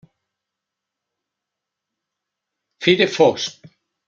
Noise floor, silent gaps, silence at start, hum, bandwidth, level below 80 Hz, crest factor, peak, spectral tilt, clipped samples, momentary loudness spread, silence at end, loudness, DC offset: -83 dBFS; none; 2.8 s; none; 7.6 kHz; -66 dBFS; 24 dB; 0 dBFS; -4.5 dB/octave; under 0.1%; 12 LU; 0.55 s; -17 LUFS; under 0.1%